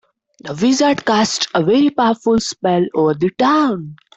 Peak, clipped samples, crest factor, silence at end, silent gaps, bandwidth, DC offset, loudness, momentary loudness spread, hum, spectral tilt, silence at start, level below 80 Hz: -4 dBFS; under 0.1%; 12 dB; 0.2 s; none; 8.4 kHz; under 0.1%; -15 LUFS; 5 LU; none; -4.5 dB/octave; 0.45 s; -54 dBFS